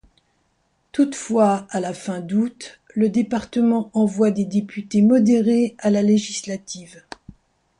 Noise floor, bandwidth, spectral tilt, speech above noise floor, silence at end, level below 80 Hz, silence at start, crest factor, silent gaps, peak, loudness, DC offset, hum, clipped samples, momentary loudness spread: -67 dBFS; 10.5 kHz; -6 dB/octave; 47 dB; 0.95 s; -60 dBFS; 0.95 s; 14 dB; none; -6 dBFS; -20 LUFS; under 0.1%; none; under 0.1%; 17 LU